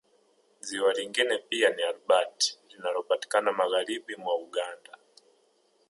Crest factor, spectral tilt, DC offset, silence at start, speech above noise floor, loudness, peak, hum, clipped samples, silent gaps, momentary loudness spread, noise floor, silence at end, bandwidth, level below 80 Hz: 20 dB; -0.5 dB/octave; under 0.1%; 0.65 s; 40 dB; -28 LUFS; -10 dBFS; none; under 0.1%; none; 10 LU; -68 dBFS; 1.15 s; 11.5 kHz; -86 dBFS